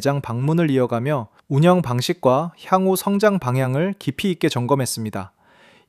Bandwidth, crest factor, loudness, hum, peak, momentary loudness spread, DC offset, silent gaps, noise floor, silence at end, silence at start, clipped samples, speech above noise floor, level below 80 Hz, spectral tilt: 15.5 kHz; 18 dB; -20 LUFS; none; -2 dBFS; 7 LU; under 0.1%; none; -52 dBFS; 0.6 s; 0 s; under 0.1%; 33 dB; -58 dBFS; -6 dB/octave